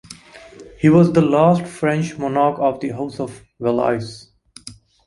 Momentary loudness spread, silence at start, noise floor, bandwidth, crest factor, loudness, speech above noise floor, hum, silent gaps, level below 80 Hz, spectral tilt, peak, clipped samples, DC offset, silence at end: 25 LU; 0.1 s; -42 dBFS; 11.5 kHz; 18 dB; -18 LUFS; 25 dB; none; none; -52 dBFS; -7.5 dB/octave; -2 dBFS; under 0.1%; under 0.1%; 0.35 s